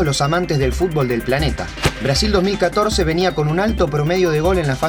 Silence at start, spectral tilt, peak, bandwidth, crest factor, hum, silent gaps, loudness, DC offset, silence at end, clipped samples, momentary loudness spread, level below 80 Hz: 0 s; -5.5 dB/octave; -2 dBFS; over 20 kHz; 16 dB; none; none; -17 LUFS; under 0.1%; 0 s; under 0.1%; 3 LU; -28 dBFS